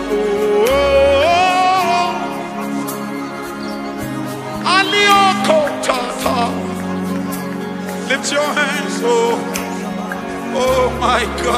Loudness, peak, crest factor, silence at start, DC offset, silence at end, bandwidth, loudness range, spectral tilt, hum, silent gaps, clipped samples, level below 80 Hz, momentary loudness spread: -16 LUFS; 0 dBFS; 16 dB; 0 s; under 0.1%; 0 s; 15.5 kHz; 4 LU; -4 dB/octave; none; none; under 0.1%; -38 dBFS; 12 LU